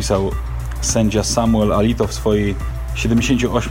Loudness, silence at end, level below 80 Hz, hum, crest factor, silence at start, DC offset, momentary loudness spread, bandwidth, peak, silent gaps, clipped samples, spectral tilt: -18 LUFS; 0 s; -26 dBFS; none; 14 dB; 0 s; under 0.1%; 9 LU; 16.5 kHz; -2 dBFS; none; under 0.1%; -5 dB/octave